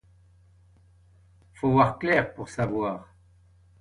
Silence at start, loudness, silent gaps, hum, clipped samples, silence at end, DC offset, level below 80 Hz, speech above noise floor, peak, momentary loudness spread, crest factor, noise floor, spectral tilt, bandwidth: 1.65 s; -25 LUFS; none; none; under 0.1%; 0.75 s; under 0.1%; -54 dBFS; 33 dB; -6 dBFS; 11 LU; 22 dB; -58 dBFS; -7.5 dB/octave; 11 kHz